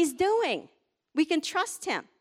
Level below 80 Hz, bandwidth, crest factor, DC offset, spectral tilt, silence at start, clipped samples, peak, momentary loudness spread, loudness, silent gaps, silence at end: -68 dBFS; 16 kHz; 16 dB; under 0.1%; -2.5 dB/octave; 0 s; under 0.1%; -14 dBFS; 8 LU; -28 LUFS; none; 0.2 s